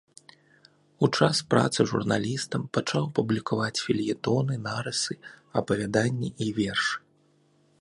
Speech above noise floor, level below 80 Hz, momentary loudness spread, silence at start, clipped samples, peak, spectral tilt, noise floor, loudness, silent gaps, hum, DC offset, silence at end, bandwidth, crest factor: 38 dB; -60 dBFS; 7 LU; 1 s; under 0.1%; -4 dBFS; -5 dB/octave; -64 dBFS; -27 LUFS; none; none; under 0.1%; 0.8 s; 11.5 kHz; 22 dB